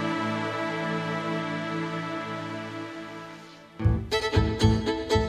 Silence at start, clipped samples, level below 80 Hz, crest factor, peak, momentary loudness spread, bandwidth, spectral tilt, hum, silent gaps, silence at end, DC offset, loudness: 0 s; under 0.1%; -38 dBFS; 18 dB; -8 dBFS; 15 LU; 12.5 kHz; -6 dB/octave; none; none; 0 s; under 0.1%; -28 LUFS